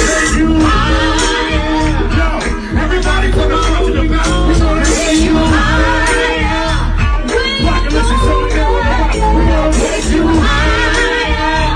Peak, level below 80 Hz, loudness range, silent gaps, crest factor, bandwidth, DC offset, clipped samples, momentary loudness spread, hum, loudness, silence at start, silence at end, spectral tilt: -2 dBFS; -14 dBFS; 2 LU; none; 10 dB; 10.5 kHz; under 0.1%; under 0.1%; 3 LU; none; -12 LUFS; 0 s; 0 s; -4.5 dB/octave